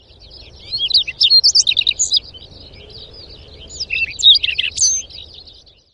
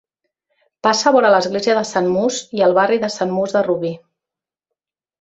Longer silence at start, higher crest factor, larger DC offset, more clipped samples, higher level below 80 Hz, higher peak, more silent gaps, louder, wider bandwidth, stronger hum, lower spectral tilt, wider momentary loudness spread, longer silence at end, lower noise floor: second, 0.35 s vs 0.85 s; about the same, 18 dB vs 16 dB; neither; neither; first, -44 dBFS vs -62 dBFS; about the same, 0 dBFS vs -2 dBFS; neither; first, -12 LUFS vs -17 LUFS; first, 11.5 kHz vs 8.2 kHz; neither; second, 2.5 dB/octave vs -4 dB/octave; first, 18 LU vs 7 LU; second, 0.7 s vs 1.25 s; second, -45 dBFS vs -88 dBFS